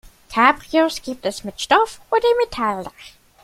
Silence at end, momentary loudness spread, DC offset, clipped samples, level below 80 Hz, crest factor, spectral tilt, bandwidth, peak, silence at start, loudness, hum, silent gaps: 0.35 s; 11 LU; under 0.1%; under 0.1%; -50 dBFS; 20 dB; -3.5 dB/octave; 15.5 kHz; 0 dBFS; 0.3 s; -19 LUFS; none; none